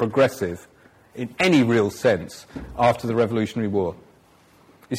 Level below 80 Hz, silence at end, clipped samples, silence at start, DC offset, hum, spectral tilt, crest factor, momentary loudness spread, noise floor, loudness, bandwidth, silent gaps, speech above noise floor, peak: -52 dBFS; 0 s; under 0.1%; 0 s; under 0.1%; none; -6 dB/octave; 16 dB; 18 LU; -55 dBFS; -21 LUFS; 16 kHz; none; 33 dB; -6 dBFS